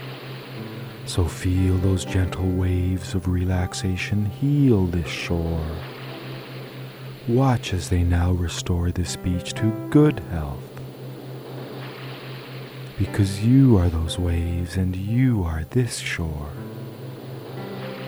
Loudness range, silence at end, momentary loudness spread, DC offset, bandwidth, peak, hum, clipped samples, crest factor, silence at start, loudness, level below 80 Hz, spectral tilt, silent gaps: 4 LU; 0 s; 17 LU; under 0.1%; over 20 kHz; -6 dBFS; none; under 0.1%; 18 dB; 0 s; -23 LUFS; -38 dBFS; -6.5 dB/octave; none